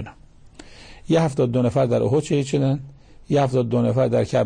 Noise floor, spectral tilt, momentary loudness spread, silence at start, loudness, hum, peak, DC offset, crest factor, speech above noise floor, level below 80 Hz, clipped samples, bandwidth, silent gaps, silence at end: -46 dBFS; -7.5 dB/octave; 4 LU; 0 s; -21 LUFS; none; -8 dBFS; under 0.1%; 12 dB; 27 dB; -48 dBFS; under 0.1%; 9.8 kHz; none; 0 s